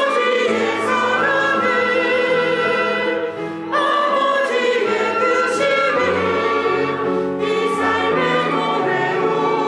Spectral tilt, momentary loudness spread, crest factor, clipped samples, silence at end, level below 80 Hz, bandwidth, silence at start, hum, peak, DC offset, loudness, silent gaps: -4.5 dB/octave; 3 LU; 12 dB; under 0.1%; 0 s; -64 dBFS; 11.5 kHz; 0 s; none; -6 dBFS; under 0.1%; -17 LUFS; none